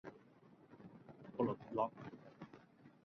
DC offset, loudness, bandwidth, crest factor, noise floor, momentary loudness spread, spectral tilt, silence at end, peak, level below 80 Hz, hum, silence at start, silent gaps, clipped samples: under 0.1%; -43 LUFS; 6.4 kHz; 24 dB; -66 dBFS; 24 LU; -7.5 dB/octave; 0.15 s; -24 dBFS; -80 dBFS; none; 0.05 s; none; under 0.1%